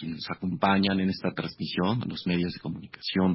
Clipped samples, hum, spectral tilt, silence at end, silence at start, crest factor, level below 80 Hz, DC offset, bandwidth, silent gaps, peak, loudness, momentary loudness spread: under 0.1%; none; -10 dB/octave; 0 s; 0 s; 20 dB; -54 dBFS; under 0.1%; 5.8 kHz; none; -8 dBFS; -28 LUFS; 11 LU